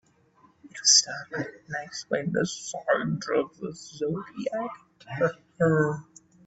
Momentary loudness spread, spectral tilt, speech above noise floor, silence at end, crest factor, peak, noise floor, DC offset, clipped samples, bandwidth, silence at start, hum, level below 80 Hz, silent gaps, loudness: 19 LU; -3 dB/octave; 34 dB; 0.45 s; 22 dB; -6 dBFS; -61 dBFS; under 0.1%; under 0.1%; 8.4 kHz; 0.65 s; none; -66 dBFS; none; -26 LUFS